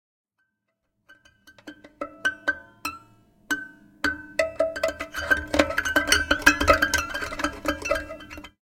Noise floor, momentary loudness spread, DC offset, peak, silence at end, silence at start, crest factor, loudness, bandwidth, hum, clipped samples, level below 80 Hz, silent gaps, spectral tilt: -78 dBFS; 15 LU; under 0.1%; 0 dBFS; 0.15 s; 1.1 s; 26 dB; -24 LUFS; 17 kHz; none; under 0.1%; -44 dBFS; none; -2.5 dB/octave